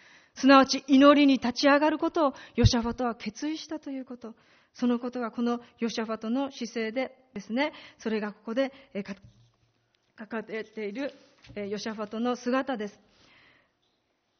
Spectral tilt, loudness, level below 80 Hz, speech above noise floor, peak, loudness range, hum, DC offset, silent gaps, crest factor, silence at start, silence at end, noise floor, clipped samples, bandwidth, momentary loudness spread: -4 dB/octave; -27 LUFS; -48 dBFS; 47 dB; -6 dBFS; 13 LU; none; under 0.1%; none; 22 dB; 0.35 s; 1.5 s; -74 dBFS; under 0.1%; 6.6 kHz; 18 LU